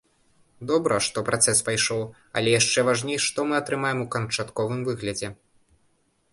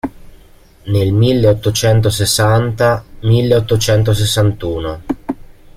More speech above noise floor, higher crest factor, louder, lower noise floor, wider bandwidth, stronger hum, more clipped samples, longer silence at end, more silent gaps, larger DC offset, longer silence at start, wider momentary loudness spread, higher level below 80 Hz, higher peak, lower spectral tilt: first, 42 dB vs 30 dB; first, 20 dB vs 12 dB; second, -24 LUFS vs -14 LUFS; first, -67 dBFS vs -43 dBFS; second, 11.5 kHz vs 15.5 kHz; neither; neither; first, 1 s vs 0.4 s; neither; neither; first, 0.6 s vs 0.05 s; about the same, 11 LU vs 11 LU; second, -58 dBFS vs -34 dBFS; second, -6 dBFS vs -2 dBFS; second, -3 dB/octave vs -5.5 dB/octave